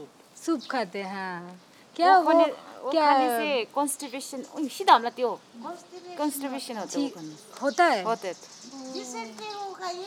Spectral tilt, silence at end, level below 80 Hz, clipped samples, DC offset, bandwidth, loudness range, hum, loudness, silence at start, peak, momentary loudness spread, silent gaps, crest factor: -3 dB/octave; 0 s; under -90 dBFS; under 0.1%; under 0.1%; 18 kHz; 5 LU; none; -26 LUFS; 0 s; -6 dBFS; 20 LU; none; 22 dB